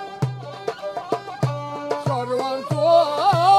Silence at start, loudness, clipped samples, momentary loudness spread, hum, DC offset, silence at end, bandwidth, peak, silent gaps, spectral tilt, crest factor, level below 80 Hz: 0 s; -22 LUFS; under 0.1%; 13 LU; none; under 0.1%; 0 s; 14 kHz; -4 dBFS; none; -6 dB/octave; 16 dB; -64 dBFS